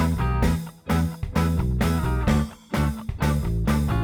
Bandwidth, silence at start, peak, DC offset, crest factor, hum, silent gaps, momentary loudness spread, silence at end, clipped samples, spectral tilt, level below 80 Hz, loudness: over 20 kHz; 0 s; -8 dBFS; under 0.1%; 16 dB; none; none; 4 LU; 0 s; under 0.1%; -7 dB/octave; -28 dBFS; -24 LUFS